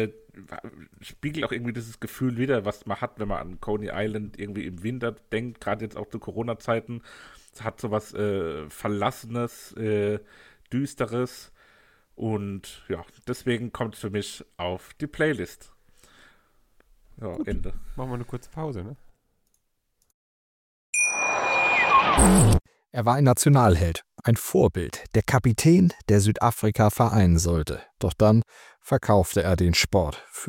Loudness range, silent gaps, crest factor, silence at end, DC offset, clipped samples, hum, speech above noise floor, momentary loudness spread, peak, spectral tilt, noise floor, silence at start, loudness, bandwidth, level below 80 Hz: 14 LU; 20.14-20.93 s; 20 dB; 0 s; under 0.1%; under 0.1%; none; 47 dB; 17 LU; -4 dBFS; -5.5 dB/octave; -72 dBFS; 0 s; -24 LUFS; 17 kHz; -40 dBFS